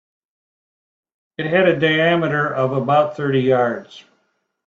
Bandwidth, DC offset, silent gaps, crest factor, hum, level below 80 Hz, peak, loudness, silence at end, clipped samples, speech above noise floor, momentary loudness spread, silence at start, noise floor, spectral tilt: 7.4 kHz; under 0.1%; none; 18 dB; none; -62 dBFS; -2 dBFS; -17 LUFS; 0.7 s; under 0.1%; 51 dB; 9 LU; 1.4 s; -68 dBFS; -7.5 dB/octave